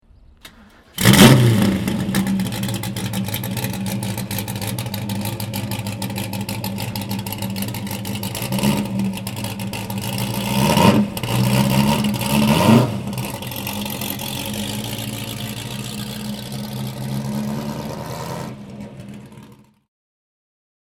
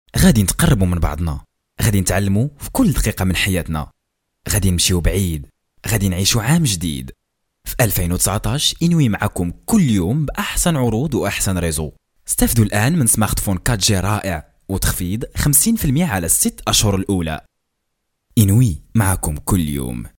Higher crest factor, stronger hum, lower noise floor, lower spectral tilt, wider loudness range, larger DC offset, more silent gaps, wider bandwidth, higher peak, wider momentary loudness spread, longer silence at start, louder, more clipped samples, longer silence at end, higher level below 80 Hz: about the same, 20 dB vs 18 dB; neither; second, -47 dBFS vs -74 dBFS; about the same, -5 dB/octave vs -4.5 dB/octave; first, 11 LU vs 2 LU; neither; neither; first, 19.5 kHz vs 17.5 kHz; about the same, 0 dBFS vs 0 dBFS; first, 14 LU vs 11 LU; first, 0.45 s vs 0.15 s; second, -20 LUFS vs -17 LUFS; neither; first, 1.35 s vs 0.1 s; second, -42 dBFS vs -30 dBFS